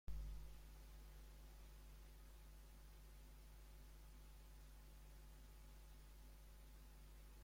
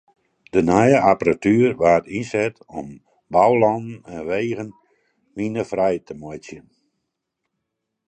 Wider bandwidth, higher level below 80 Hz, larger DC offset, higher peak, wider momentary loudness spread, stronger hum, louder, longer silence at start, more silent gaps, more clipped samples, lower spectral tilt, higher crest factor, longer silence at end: first, 16.5 kHz vs 9 kHz; second, -60 dBFS vs -52 dBFS; neither; second, -38 dBFS vs 0 dBFS; second, 4 LU vs 20 LU; neither; second, -63 LUFS vs -19 LUFS; second, 0.05 s vs 0.55 s; neither; neither; second, -4.5 dB/octave vs -7 dB/octave; about the same, 20 dB vs 20 dB; second, 0 s vs 1.5 s